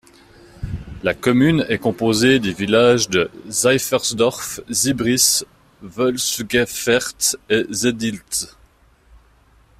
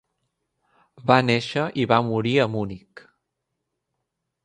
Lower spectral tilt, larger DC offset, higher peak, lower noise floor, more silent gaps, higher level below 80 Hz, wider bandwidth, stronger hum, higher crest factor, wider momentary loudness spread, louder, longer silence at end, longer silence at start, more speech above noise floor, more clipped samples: second, -3.5 dB/octave vs -6.5 dB/octave; neither; about the same, -2 dBFS vs 0 dBFS; second, -53 dBFS vs -80 dBFS; neither; first, -46 dBFS vs -60 dBFS; first, 16 kHz vs 10 kHz; neither; second, 18 dB vs 24 dB; about the same, 10 LU vs 11 LU; first, -18 LUFS vs -22 LUFS; second, 1.35 s vs 1.65 s; second, 0.55 s vs 1 s; second, 35 dB vs 58 dB; neither